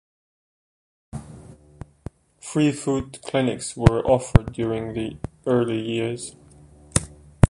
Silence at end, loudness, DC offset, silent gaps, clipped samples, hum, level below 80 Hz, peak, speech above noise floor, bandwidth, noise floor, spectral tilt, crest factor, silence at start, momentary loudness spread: 0.05 s; -23 LUFS; under 0.1%; none; under 0.1%; none; -36 dBFS; 0 dBFS; 27 dB; 11.5 kHz; -49 dBFS; -6 dB/octave; 24 dB; 1.15 s; 21 LU